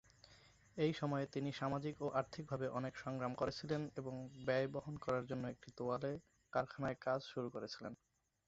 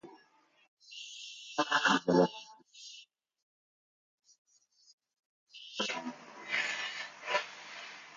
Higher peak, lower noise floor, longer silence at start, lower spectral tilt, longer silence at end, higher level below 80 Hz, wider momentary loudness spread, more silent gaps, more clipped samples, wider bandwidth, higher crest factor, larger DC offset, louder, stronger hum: second, -24 dBFS vs -14 dBFS; about the same, -67 dBFS vs -67 dBFS; first, 0.3 s vs 0.05 s; first, -5.5 dB/octave vs -3.5 dB/octave; first, 0.55 s vs 0 s; first, -72 dBFS vs -82 dBFS; second, 9 LU vs 23 LU; second, none vs 0.68-0.77 s, 3.42-4.18 s, 4.38-4.45 s, 4.93-4.98 s, 5.19-5.47 s; neither; second, 7.6 kHz vs 9.4 kHz; about the same, 20 dB vs 24 dB; neither; second, -43 LUFS vs -33 LUFS; neither